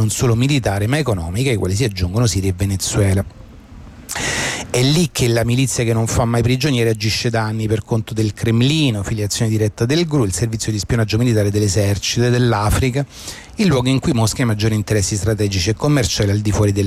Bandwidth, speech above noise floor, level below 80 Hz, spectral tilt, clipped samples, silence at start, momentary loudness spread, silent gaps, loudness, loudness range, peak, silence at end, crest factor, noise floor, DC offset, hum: 15.5 kHz; 21 dB; -34 dBFS; -5 dB/octave; under 0.1%; 0 s; 5 LU; none; -17 LUFS; 2 LU; -6 dBFS; 0 s; 12 dB; -38 dBFS; under 0.1%; none